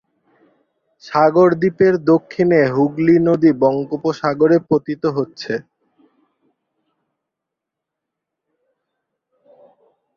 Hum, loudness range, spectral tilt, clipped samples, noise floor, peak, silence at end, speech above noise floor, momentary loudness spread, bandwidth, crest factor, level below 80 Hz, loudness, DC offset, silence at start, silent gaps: none; 13 LU; -8 dB/octave; under 0.1%; -82 dBFS; -2 dBFS; 4.55 s; 67 dB; 10 LU; 6.8 kHz; 16 dB; -60 dBFS; -16 LUFS; under 0.1%; 1.05 s; none